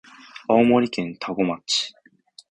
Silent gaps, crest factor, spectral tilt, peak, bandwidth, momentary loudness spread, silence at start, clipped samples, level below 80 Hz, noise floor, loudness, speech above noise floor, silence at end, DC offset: none; 20 dB; -4.5 dB/octave; -4 dBFS; 9.8 kHz; 16 LU; 0.35 s; under 0.1%; -60 dBFS; -52 dBFS; -22 LUFS; 32 dB; 0.6 s; under 0.1%